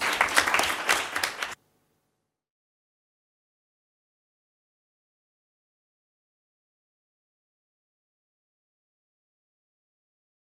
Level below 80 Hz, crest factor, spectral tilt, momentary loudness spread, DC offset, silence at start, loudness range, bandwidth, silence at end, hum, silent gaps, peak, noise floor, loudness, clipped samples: -66 dBFS; 28 dB; 0 dB/octave; 13 LU; under 0.1%; 0 s; 14 LU; 16 kHz; 9 s; none; none; -6 dBFS; -79 dBFS; -24 LUFS; under 0.1%